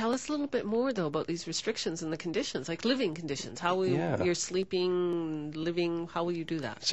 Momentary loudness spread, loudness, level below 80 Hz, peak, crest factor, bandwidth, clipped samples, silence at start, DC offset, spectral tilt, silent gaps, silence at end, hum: 5 LU; -32 LUFS; -64 dBFS; -14 dBFS; 16 dB; 8.4 kHz; under 0.1%; 0 s; 0.2%; -4.5 dB/octave; none; 0 s; none